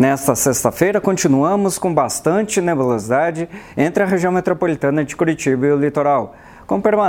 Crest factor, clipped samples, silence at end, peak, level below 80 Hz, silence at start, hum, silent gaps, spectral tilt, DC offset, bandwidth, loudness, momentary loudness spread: 16 dB; under 0.1%; 0 s; 0 dBFS; -50 dBFS; 0 s; none; none; -5.5 dB/octave; under 0.1%; 17.5 kHz; -17 LUFS; 4 LU